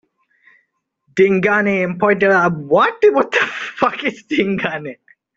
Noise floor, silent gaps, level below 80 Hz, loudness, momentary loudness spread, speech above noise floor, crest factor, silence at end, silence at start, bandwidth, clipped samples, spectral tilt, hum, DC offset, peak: -66 dBFS; none; -58 dBFS; -16 LUFS; 10 LU; 51 dB; 14 dB; 0.45 s; 1.15 s; 7.6 kHz; under 0.1%; -6 dB/octave; none; under 0.1%; -2 dBFS